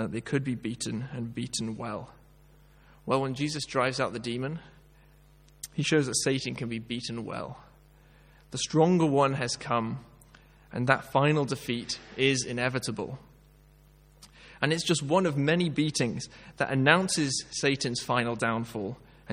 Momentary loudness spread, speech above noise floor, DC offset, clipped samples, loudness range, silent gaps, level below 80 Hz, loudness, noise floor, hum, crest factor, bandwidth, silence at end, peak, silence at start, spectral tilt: 14 LU; 29 dB; under 0.1%; under 0.1%; 6 LU; none; -60 dBFS; -28 LUFS; -57 dBFS; none; 26 dB; 16 kHz; 0 s; -4 dBFS; 0 s; -4.5 dB/octave